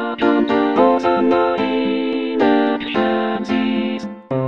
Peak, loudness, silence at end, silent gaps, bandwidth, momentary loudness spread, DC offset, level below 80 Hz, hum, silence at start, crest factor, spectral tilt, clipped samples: -2 dBFS; -17 LUFS; 0 s; none; 7.2 kHz; 6 LU; 0.3%; -54 dBFS; none; 0 s; 16 dB; -7 dB/octave; under 0.1%